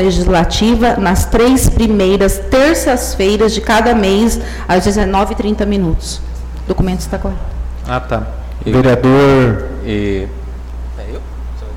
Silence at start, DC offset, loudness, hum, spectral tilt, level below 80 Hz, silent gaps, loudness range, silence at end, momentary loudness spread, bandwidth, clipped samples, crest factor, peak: 0 s; under 0.1%; -13 LUFS; none; -5.5 dB/octave; -20 dBFS; none; 6 LU; 0 s; 16 LU; 17.5 kHz; under 0.1%; 8 dB; -4 dBFS